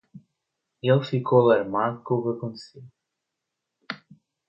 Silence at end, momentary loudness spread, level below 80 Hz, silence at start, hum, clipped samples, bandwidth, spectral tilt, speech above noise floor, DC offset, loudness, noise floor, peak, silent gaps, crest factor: 0.55 s; 19 LU; -70 dBFS; 0.15 s; none; under 0.1%; 8.2 kHz; -8.5 dB/octave; 60 dB; under 0.1%; -23 LUFS; -83 dBFS; -8 dBFS; none; 18 dB